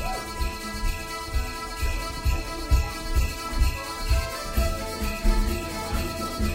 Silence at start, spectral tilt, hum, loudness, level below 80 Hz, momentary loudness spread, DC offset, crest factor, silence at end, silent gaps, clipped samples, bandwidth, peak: 0 s; -4.5 dB/octave; none; -29 LUFS; -28 dBFS; 5 LU; 0.1%; 18 dB; 0 s; none; under 0.1%; 16 kHz; -8 dBFS